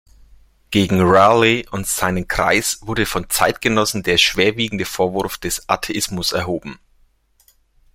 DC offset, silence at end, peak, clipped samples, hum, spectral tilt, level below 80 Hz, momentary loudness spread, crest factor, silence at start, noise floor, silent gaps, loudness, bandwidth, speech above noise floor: under 0.1%; 1.2 s; 0 dBFS; under 0.1%; none; -3.5 dB/octave; -42 dBFS; 10 LU; 18 dB; 0.7 s; -57 dBFS; none; -17 LUFS; 16.5 kHz; 40 dB